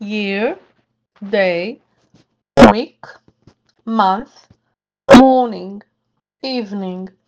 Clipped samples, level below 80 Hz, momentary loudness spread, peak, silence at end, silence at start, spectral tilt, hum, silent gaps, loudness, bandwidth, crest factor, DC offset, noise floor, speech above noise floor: 0.6%; -40 dBFS; 22 LU; 0 dBFS; 0.2 s; 0 s; -5.5 dB/octave; none; none; -13 LUFS; 10 kHz; 16 dB; under 0.1%; -72 dBFS; 57 dB